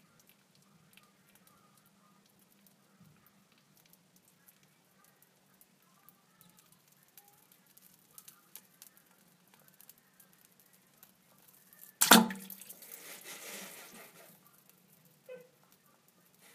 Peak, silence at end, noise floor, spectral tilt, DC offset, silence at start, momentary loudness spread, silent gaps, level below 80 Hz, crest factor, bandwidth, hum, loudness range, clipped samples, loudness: -2 dBFS; 1.2 s; -67 dBFS; -2 dB/octave; under 0.1%; 12 s; 35 LU; none; -80 dBFS; 38 dB; 15.5 kHz; none; 20 LU; under 0.1%; -29 LUFS